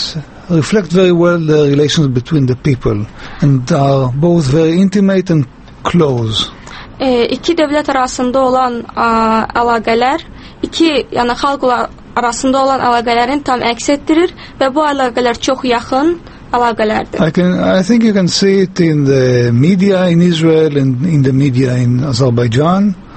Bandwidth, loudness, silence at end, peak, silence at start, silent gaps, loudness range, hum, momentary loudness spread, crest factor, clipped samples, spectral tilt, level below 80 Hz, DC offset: 8.8 kHz; -12 LUFS; 0 s; 0 dBFS; 0 s; none; 3 LU; none; 6 LU; 12 dB; under 0.1%; -6 dB/octave; -38 dBFS; under 0.1%